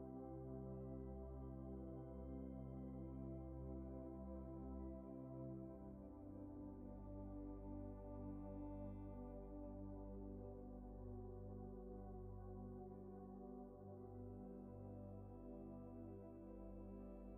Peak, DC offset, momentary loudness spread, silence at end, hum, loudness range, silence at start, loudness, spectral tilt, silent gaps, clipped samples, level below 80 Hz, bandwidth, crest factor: -40 dBFS; under 0.1%; 4 LU; 0 s; none; 3 LU; 0 s; -55 LUFS; -10 dB/octave; none; under 0.1%; -60 dBFS; 3.1 kHz; 12 dB